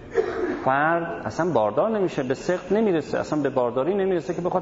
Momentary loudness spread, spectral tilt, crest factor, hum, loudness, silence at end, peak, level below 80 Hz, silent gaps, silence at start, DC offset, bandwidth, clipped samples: 5 LU; -6.5 dB/octave; 16 dB; none; -24 LUFS; 0 s; -6 dBFS; -54 dBFS; none; 0 s; under 0.1%; 7.8 kHz; under 0.1%